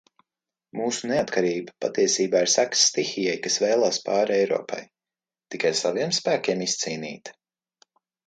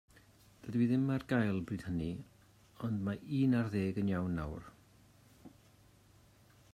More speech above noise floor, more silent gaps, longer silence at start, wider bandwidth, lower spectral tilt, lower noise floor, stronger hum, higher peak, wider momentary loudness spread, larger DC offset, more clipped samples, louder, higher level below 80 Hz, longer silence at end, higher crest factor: first, over 66 dB vs 30 dB; neither; about the same, 0.75 s vs 0.65 s; second, 11 kHz vs 14 kHz; second, -2.5 dB/octave vs -8.5 dB/octave; first, under -90 dBFS vs -64 dBFS; neither; first, -6 dBFS vs -18 dBFS; about the same, 14 LU vs 13 LU; neither; neither; first, -23 LUFS vs -35 LUFS; second, -70 dBFS vs -60 dBFS; second, 0.95 s vs 1.25 s; about the same, 20 dB vs 18 dB